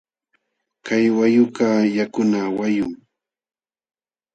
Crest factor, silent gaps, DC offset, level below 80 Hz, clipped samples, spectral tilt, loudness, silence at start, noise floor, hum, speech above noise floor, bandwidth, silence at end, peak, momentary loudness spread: 16 dB; none; under 0.1%; -62 dBFS; under 0.1%; -6.5 dB/octave; -19 LUFS; 0.85 s; -70 dBFS; none; 52 dB; 8.2 kHz; 1.4 s; -4 dBFS; 8 LU